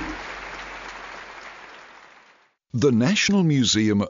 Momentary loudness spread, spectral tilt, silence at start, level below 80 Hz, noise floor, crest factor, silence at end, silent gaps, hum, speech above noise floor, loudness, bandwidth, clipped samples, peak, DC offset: 21 LU; -4.5 dB/octave; 0 s; -52 dBFS; -58 dBFS; 16 dB; 0 s; none; none; 39 dB; -21 LUFS; 7.6 kHz; under 0.1%; -8 dBFS; under 0.1%